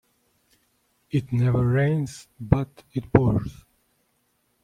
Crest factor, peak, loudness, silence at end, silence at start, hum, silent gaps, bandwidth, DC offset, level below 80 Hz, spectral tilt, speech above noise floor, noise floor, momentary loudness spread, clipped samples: 24 dB; -2 dBFS; -24 LUFS; 1.1 s; 1.15 s; none; none; 11 kHz; under 0.1%; -44 dBFS; -8.5 dB/octave; 47 dB; -70 dBFS; 13 LU; under 0.1%